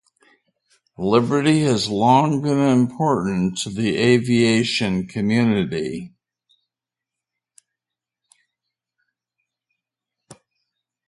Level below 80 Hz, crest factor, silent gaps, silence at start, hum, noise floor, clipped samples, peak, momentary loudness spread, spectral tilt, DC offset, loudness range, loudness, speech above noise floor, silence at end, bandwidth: -56 dBFS; 20 dB; none; 1 s; none; -87 dBFS; under 0.1%; -2 dBFS; 7 LU; -6 dB/octave; under 0.1%; 8 LU; -19 LUFS; 69 dB; 0.75 s; 11.5 kHz